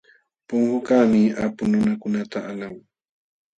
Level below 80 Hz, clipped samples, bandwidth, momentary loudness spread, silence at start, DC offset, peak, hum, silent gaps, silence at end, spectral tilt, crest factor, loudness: -58 dBFS; under 0.1%; 8 kHz; 14 LU; 0.5 s; under 0.1%; -4 dBFS; none; none; 0.8 s; -7.5 dB/octave; 18 dB; -21 LUFS